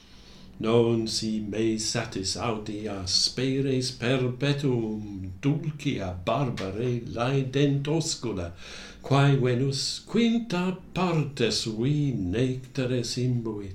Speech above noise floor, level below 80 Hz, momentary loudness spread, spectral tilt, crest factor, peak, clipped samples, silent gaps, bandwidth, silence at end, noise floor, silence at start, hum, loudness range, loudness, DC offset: 22 dB; -52 dBFS; 8 LU; -5 dB/octave; 18 dB; -8 dBFS; under 0.1%; none; 12.5 kHz; 0 s; -48 dBFS; 0.15 s; none; 3 LU; -27 LUFS; under 0.1%